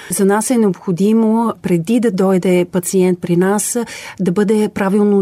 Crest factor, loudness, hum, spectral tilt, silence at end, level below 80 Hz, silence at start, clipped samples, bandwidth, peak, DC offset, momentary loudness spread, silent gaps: 10 dB; -15 LUFS; none; -6 dB/octave; 0 s; -56 dBFS; 0 s; under 0.1%; 16 kHz; -4 dBFS; under 0.1%; 5 LU; none